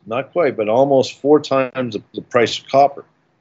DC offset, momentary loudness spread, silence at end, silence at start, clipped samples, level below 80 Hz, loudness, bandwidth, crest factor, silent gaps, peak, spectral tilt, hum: under 0.1%; 8 LU; 0.4 s; 0.05 s; under 0.1%; -66 dBFS; -17 LUFS; 7.8 kHz; 16 dB; none; 0 dBFS; -5.5 dB/octave; none